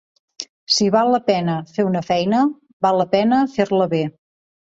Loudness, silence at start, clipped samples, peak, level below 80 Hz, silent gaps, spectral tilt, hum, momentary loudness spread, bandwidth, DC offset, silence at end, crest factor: -18 LUFS; 0.4 s; under 0.1%; -2 dBFS; -60 dBFS; 0.49-0.67 s, 2.73-2.80 s; -5 dB/octave; none; 8 LU; 7.8 kHz; under 0.1%; 0.65 s; 16 dB